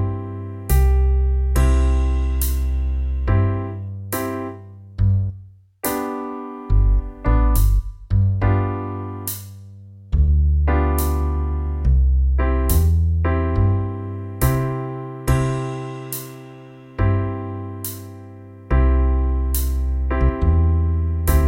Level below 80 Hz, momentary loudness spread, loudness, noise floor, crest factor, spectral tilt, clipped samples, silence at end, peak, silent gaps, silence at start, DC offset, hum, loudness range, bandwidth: -22 dBFS; 13 LU; -21 LUFS; -42 dBFS; 14 dB; -7 dB/octave; under 0.1%; 0 s; -4 dBFS; none; 0 s; under 0.1%; none; 5 LU; 17 kHz